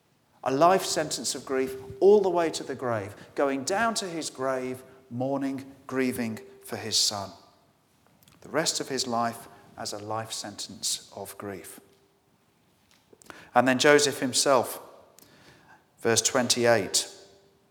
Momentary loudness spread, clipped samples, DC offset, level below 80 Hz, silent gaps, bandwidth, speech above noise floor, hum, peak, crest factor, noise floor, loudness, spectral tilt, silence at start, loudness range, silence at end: 17 LU; under 0.1%; under 0.1%; -70 dBFS; none; 19.5 kHz; 39 dB; none; -4 dBFS; 24 dB; -66 dBFS; -26 LUFS; -2.5 dB/octave; 0.45 s; 8 LU; 0.5 s